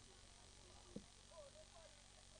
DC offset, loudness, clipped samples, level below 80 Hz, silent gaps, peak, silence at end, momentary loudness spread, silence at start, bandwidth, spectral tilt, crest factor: under 0.1%; -62 LUFS; under 0.1%; -70 dBFS; none; -36 dBFS; 0 s; 4 LU; 0 s; 10 kHz; -3.5 dB/octave; 26 dB